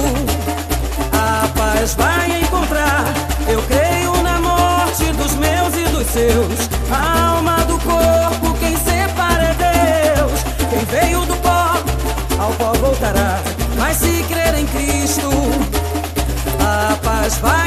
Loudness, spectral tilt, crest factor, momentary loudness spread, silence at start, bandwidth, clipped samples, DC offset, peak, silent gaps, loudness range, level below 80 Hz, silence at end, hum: -16 LUFS; -4.5 dB/octave; 16 dB; 5 LU; 0 s; 15 kHz; under 0.1%; under 0.1%; 0 dBFS; none; 2 LU; -22 dBFS; 0 s; none